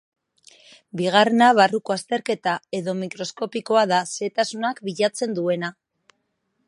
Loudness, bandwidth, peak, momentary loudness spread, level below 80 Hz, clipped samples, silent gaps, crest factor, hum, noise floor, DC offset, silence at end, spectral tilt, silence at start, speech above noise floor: -22 LUFS; 11.5 kHz; -2 dBFS; 13 LU; -74 dBFS; under 0.1%; none; 22 dB; none; -73 dBFS; under 0.1%; 0.95 s; -4 dB/octave; 0.95 s; 52 dB